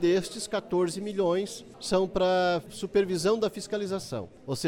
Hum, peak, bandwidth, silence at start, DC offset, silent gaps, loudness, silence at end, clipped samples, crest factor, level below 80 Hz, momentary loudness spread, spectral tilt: none; -12 dBFS; 16.5 kHz; 0 s; under 0.1%; none; -28 LUFS; 0 s; under 0.1%; 16 dB; -56 dBFS; 10 LU; -5 dB/octave